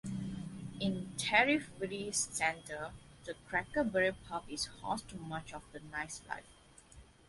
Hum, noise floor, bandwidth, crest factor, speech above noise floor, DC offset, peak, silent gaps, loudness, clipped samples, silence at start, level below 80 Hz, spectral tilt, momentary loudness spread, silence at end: none; -59 dBFS; 12 kHz; 24 dB; 22 dB; under 0.1%; -12 dBFS; none; -36 LUFS; under 0.1%; 0.05 s; -62 dBFS; -3.5 dB/octave; 16 LU; 0.25 s